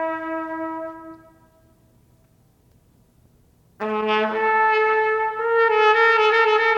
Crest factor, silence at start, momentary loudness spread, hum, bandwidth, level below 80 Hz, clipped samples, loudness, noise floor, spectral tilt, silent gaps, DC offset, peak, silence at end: 18 dB; 0 s; 15 LU; none; 7.2 kHz; -64 dBFS; under 0.1%; -19 LUFS; -58 dBFS; -4 dB/octave; none; under 0.1%; -4 dBFS; 0 s